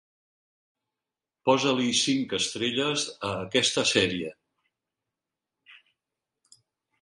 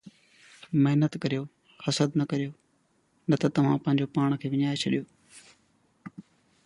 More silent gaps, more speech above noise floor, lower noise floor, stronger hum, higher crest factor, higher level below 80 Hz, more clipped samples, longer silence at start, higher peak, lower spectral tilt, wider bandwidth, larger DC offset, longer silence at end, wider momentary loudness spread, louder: neither; first, 63 dB vs 43 dB; first, -89 dBFS vs -69 dBFS; neither; first, 24 dB vs 18 dB; about the same, -64 dBFS vs -68 dBFS; neither; first, 1.45 s vs 0.05 s; first, -6 dBFS vs -10 dBFS; second, -3 dB/octave vs -6.5 dB/octave; about the same, 11.5 kHz vs 11 kHz; neither; first, 1.25 s vs 0.45 s; second, 8 LU vs 21 LU; about the same, -25 LUFS vs -27 LUFS